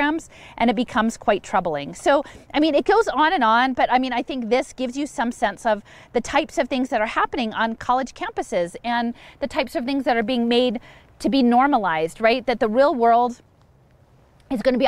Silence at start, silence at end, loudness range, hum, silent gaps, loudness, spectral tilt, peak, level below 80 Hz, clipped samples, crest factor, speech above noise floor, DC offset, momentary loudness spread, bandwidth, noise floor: 0 s; 0 s; 4 LU; none; none; -21 LUFS; -4.5 dB/octave; -4 dBFS; -50 dBFS; under 0.1%; 16 dB; 34 dB; under 0.1%; 10 LU; 13 kHz; -55 dBFS